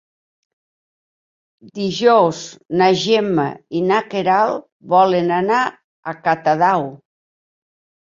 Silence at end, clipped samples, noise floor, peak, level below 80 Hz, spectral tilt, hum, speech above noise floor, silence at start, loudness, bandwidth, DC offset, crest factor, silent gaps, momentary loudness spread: 1.15 s; under 0.1%; under -90 dBFS; -2 dBFS; -64 dBFS; -5.5 dB/octave; none; over 74 dB; 1.65 s; -17 LUFS; 7.6 kHz; under 0.1%; 18 dB; 4.72-4.80 s, 5.84-6.03 s; 13 LU